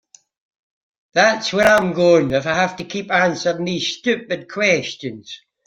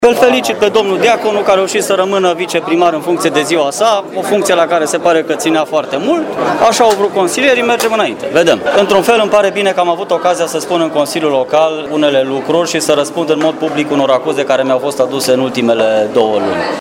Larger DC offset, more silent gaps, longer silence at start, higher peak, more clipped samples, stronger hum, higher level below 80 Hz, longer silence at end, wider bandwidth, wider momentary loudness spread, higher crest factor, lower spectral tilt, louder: neither; neither; first, 1.15 s vs 0 s; about the same, -2 dBFS vs 0 dBFS; second, under 0.1% vs 0.1%; neither; about the same, -54 dBFS vs -52 dBFS; first, 0.3 s vs 0 s; about the same, 16 kHz vs 17.5 kHz; first, 14 LU vs 4 LU; first, 18 dB vs 12 dB; about the same, -4 dB/octave vs -3.5 dB/octave; second, -18 LUFS vs -12 LUFS